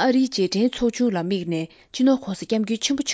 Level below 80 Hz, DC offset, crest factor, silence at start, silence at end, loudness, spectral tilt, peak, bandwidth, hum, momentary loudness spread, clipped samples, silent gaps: -54 dBFS; under 0.1%; 14 dB; 0 s; 0 s; -22 LUFS; -4.5 dB/octave; -8 dBFS; 8 kHz; none; 6 LU; under 0.1%; none